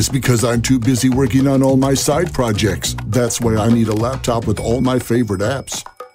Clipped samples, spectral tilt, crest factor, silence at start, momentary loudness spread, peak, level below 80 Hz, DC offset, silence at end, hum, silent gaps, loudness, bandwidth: under 0.1%; -5.5 dB/octave; 14 dB; 0 s; 6 LU; -2 dBFS; -34 dBFS; under 0.1%; 0.05 s; none; none; -16 LUFS; 16 kHz